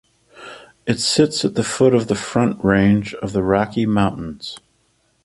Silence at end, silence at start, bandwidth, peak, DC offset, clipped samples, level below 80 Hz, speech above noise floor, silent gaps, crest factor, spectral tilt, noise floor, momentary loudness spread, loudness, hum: 0.65 s; 0.35 s; 11.5 kHz; -2 dBFS; under 0.1%; under 0.1%; -44 dBFS; 45 dB; none; 18 dB; -5 dB/octave; -63 dBFS; 17 LU; -18 LUFS; none